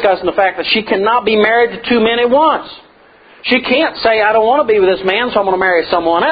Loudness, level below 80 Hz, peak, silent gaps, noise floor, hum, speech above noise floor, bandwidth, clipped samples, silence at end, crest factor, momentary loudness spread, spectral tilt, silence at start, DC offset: -12 LUFS; -48 dBFS; 0 dBFS; none; -44 dBFS; none; 32 dB; 5 kHz; under 0.1%; 0 s; 12 dB; 4 LU; -7.5 dB/octave; 0 s; under 0.1%